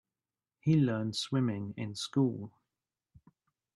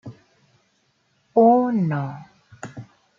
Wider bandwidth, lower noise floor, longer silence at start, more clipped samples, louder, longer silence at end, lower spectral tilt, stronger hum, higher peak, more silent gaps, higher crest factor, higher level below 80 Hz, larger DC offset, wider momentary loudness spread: first, 12 kHz vs 7.6 kHz; first, under -90 dBFS vs -66 dBFS; first, 0.65 s vs 0.05 s; neither; second, -32 LUFS vs -19 LUFS; first, 1.25 s vs 0.35 s; second, -6.5 dB/octave vs -9 dB/octave; neither; second, -18 dBFS vs -4 dBFS; neither; about the same, 16 dB vs 18 dB; about the same, -72 dBFS vs -68 dBFS; neither; second, 11 LU vs 25 LU